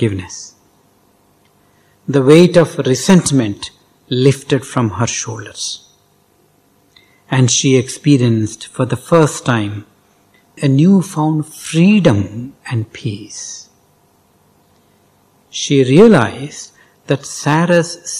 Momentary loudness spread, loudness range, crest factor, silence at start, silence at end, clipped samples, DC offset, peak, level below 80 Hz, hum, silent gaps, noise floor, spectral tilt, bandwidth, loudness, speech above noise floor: 19 LU; 6 LU; 14 dB; 0 s; 0 s; 0.5%; under 0.1%; 0 dBFS; -52 dBFS; 50 Hz at -40 dBFS; none; -54 dBFS; -5.5 dB/octave; 14.5 kHz; -14 LUFS; 41 dB